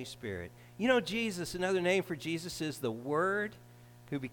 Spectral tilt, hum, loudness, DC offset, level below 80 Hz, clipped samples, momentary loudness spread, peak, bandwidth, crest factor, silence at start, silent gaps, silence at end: -4.5 dB/octave; 60 Hz at -55 dBFS; -34 LUFS; under 0.1%; -64 dBFS; under 0.1%; 12 LU; -14 dBFS; 19 kHz; 20 dB; 0 s; none; 0 s